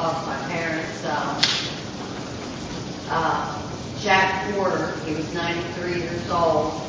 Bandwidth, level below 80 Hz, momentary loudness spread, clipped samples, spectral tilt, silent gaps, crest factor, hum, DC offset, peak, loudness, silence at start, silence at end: 7.8 kHz; -48 dBFS; 12 LU; under 0.1%; -4 dB/octave; none; 24 dB; none; under 0.1%; -2 dBFS; -24 LUFS; 0 s; 0 s